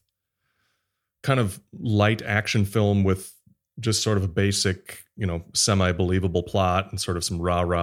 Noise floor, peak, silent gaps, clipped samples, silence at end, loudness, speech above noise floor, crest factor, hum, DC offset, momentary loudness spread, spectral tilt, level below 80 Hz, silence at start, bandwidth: -78 dBFS; -4 dBFS; none; under 0.1%; 0 s; -24 LUFS; 55 dB; 20 dB; none; under 0.1%; 9 LU; -4.5 dB/octave; -48 dBFS; 1.25 s; 15.5 kHz